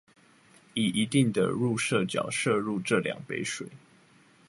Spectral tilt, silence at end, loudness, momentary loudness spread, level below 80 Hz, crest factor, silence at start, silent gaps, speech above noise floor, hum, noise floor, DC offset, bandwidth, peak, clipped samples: -5 dB/octave; 0.7 s; -28 LUFS; 9 LU; -66 dBFS; 18 dB; 0.75 s; none; 32 dB; none; -60 dBFS; under 0.1%; 11.5 kHz; -10 dBFS; under 0.1%